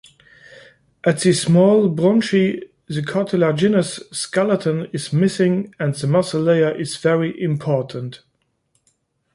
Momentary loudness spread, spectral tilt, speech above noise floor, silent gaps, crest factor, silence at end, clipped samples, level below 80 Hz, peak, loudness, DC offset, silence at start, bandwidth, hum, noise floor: 10 LU; -6 dB/octave; 49 dB; none; 16 dB; 1.2 s; under 0.1%; -60 dBFS; -2 dBFS; -18 LUFS; under 0.1%; 0.55 s; 11.5 kHz; none; -67 dBFS